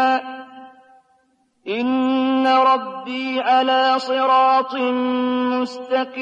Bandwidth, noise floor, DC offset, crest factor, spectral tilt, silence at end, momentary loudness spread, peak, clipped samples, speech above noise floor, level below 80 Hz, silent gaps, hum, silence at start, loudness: 7.8 kHz; -63 dBFS; under 0.1%; 14 dB; -4 dB/octave; 0 s; 11 LU; -6 dBFS; under 0.1%; 44 dB; -70 dBFS; none; none; 0 s; -18 LUFS